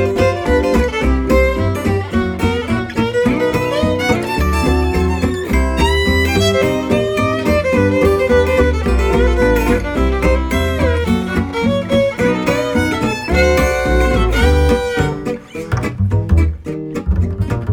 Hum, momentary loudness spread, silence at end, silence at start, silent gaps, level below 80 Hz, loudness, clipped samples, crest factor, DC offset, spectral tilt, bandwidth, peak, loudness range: none; 5 LU; 0 s; 0 s; none; -20 dBFS; -15 LUFS; under 0.1%; 14 dB; under 0.1%; -6 dB/octave; 19 kHz; 0 dBFS; 2 LU